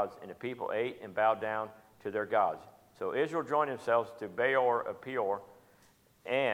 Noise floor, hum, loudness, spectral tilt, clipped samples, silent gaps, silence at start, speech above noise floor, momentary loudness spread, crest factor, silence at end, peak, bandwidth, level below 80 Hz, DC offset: -65 dBFS; none; -33 LUFS; -5.5 dB/octave; under 0.1%; none; 0 s; 33 dB; 11 LU; 18 dB; 0 s; -14 dBFS; 15.5 kHz; -78 dBFS; under 0.1%